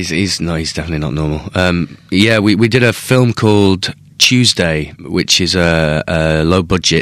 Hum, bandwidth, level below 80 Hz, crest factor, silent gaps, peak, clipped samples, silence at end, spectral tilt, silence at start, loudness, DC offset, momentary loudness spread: none; 16.5 kHz; -32 dBFS; 12 dB; none; 0 dBFS; 0.3%; 0 s; -4.5 dB/octave; 0 s; -13 LUFS; under 0.1%; 9 LU